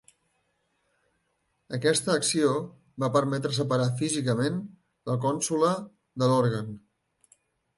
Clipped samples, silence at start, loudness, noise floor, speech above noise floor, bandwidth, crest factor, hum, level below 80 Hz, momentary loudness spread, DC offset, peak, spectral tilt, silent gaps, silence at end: under 0.1%; 1.7 s; -27 LUFS; -75 dBFS; 49 dB; 11.5 kHz; 18 dB; none; -68 dBFS; 15 LU; under 0.1%; -10 dBFS; -5 dB/octave; none; 1 s